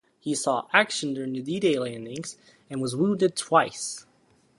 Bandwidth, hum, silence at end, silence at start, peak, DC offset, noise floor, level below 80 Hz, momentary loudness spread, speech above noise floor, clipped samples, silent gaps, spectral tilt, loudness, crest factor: 11.5 kHz; none; 0.6 s; 0.25 s; -2 dBFS; under 0.1%; -63 dBFS; -70 dBFS; 14 LU; 37 dB; under 0.1%; none; -4 dB/octave; -26 LUFS; 24 dB